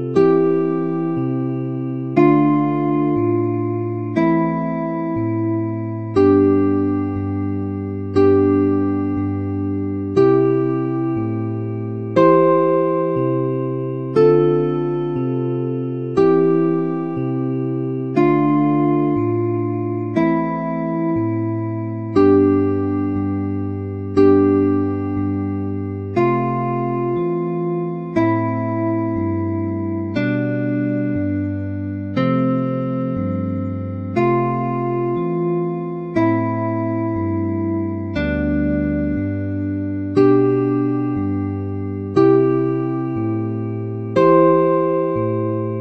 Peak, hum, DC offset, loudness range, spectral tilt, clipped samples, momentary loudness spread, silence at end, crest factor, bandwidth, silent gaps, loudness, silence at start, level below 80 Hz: -2 dBFS; none; under 0.1%; 4 LU; -10.5 dB/octave; under 0.1%; 9 LU; 0 s; 16 dB; 6.2 kHz; none; -19 LUFS; 0 s; -46 dBFS